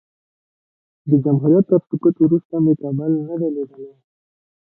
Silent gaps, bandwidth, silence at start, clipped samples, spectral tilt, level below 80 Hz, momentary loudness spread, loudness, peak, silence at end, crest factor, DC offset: 2.45-2.50 s; 1.7 kHz; 1.05 s; under 0.1%; -16 dB/octave; -62 dBFS; 9 LU; -18 LUFS; -2 dBFS; 0.8 s; 16 dB; under 0.1%